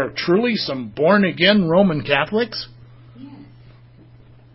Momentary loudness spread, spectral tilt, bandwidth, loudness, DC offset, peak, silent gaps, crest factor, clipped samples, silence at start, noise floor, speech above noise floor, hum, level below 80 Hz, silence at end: 11 LU; -9.5 dB/octave; 5.8 kHz; -17 LUFS; under 0.1%; -2 dBFS; none; 18 dB; under 0.1%; 0 s; -46 dBFS; 29 dB; none; -54 dBFS; 1.1 s